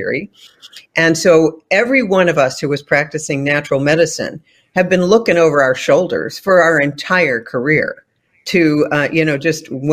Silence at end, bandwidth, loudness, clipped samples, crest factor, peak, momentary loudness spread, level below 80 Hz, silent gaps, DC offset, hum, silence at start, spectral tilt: 0 s; 15.5 kHz; -14 LUFS; under 0.1%; 14 dB; 0 dBFS; 9 LU; -54 dBFS; none; under 0.1%; none; 0 s; -5 dB/octave